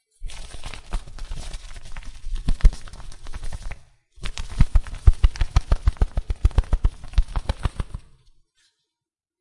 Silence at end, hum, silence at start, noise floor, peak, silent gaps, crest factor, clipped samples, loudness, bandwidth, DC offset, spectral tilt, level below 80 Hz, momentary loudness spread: 1.4 s; none; 0.2 s; -87 dBFS; 0 dBFS; none; 22 dB; under 0.1%; -26 LUFS; 11 kHz; under 0.1%; -6 dB/octave; -24 dBFS; 18 LU